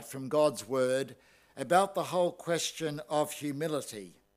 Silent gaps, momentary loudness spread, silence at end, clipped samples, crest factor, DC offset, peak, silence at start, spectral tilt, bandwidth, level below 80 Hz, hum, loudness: none; 11 LU; 0.25 s; under 0.1%; 22 dB; under 0.1%; -10 dBFS; 0 s; -4 dB/octave; 16 kHz; -78 dBFS; none; -31 LUFS